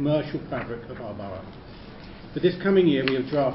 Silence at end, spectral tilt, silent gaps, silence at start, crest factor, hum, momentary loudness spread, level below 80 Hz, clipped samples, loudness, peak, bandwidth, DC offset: 0 s; -11 dB/octave; none; 0 s; 22 dB; none; 22 LU; -50 dBFS; under 0.1%; -25 LUFS; -4 dBFS; 5.8 kHz; under 0.1%